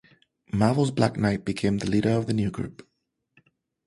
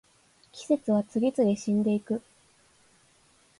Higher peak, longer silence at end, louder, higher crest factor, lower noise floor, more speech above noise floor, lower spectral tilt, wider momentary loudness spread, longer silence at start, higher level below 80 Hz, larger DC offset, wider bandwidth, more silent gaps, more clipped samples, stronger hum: first, -6 dBFS vs -12 dBFS; second, 1.15 s vs 1.4 s; about the same, -25 LUFS vs -27 LUFS; about the same, 20 dB vs 16 dB; first, -67 dBFS vs -63 dBFS; first, 43 dB vs 37 dB; about the same, -7 dB/octave vs -7 dB/octave; about the same, 9 LU vs 10 LU; about the same, 0.55 s vs 0.55 s; first, -50 dBFS vs -70 dBFS; neither; about the same, 11.5 kHz vs 11.5 kHz; neither; neither; neither